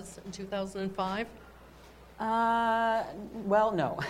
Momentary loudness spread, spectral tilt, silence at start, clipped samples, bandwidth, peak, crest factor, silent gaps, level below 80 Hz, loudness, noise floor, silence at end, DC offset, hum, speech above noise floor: 13 LU; -5.5 dB/octave; 0 s; under 0.1%; 16 kHz; -14 dBFS; 18 dB; none; -58 dBFS; -30 LUFS; -53 dBFS; 0 s; under 0.1%; none; 23 dB